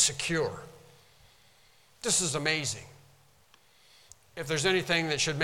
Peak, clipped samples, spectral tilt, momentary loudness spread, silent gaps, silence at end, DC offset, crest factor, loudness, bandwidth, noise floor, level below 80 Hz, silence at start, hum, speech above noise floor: -10 dBFS; under 0.1%; -2.5 dB/octave; 16 LU; none; 0 s; under 0.1%; 22 dB; -28 LUFS; 18 kHz; -63 dBFS; -60 dBFS; 0 s; none; 33 dB